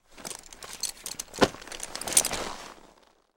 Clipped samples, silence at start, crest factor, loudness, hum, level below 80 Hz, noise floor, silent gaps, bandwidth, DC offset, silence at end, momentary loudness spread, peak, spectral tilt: under 0.1%; 0.1 s; 30 dB; -28 LUFS; none; -52 dBFS; -60 dBFS; none; 19 kHz; under 0.1%; 0.5 s; 18 LU; -2 dBFS; -1.5 dB/octave